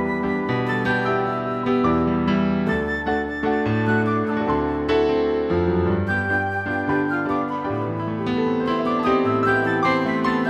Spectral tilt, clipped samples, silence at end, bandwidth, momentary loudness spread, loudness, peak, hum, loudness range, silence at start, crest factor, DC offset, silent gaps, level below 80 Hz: -8 dB/octave; under 0.1%; 0 s; 8.4 kHz; 5 LU; -21 LUFS; -6 dBFS; none; 1 LU; 0 s; 14 dB; under 0.1%; none; -44 dBFS